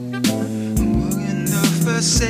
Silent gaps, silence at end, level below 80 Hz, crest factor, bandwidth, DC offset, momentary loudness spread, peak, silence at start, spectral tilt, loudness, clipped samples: none; 0 s; -30 dBFS; 16 dB; 16 kHz; under 0.1%; 5 LU; -4 dBFS; 0 s; -4.5 dB/octave; -19 LUFS; under 0.1%